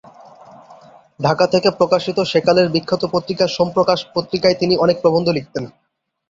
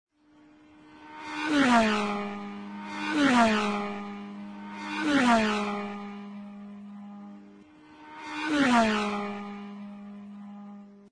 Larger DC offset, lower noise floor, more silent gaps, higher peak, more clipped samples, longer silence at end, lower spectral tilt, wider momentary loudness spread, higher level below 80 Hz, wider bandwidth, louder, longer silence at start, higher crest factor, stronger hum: neither; second, -44 dBFS vs -58 dBFS; neither; first, -2 dBFS vs -10 dBFS; neither; first, 0.6 s vs 0.05 s; first, -6 dB/octave vs -4.5 dB/octave; second, 7 LU vs 22 LU; first, -54 dBFS vs -62 dBFS; second, 7.6 kHz vs 10.5 kHz; first, -17 LUFS vs -26 LUFS; second, 0.7 s vs 0.85 s; about the same, 16 dB vs 18 dB; neither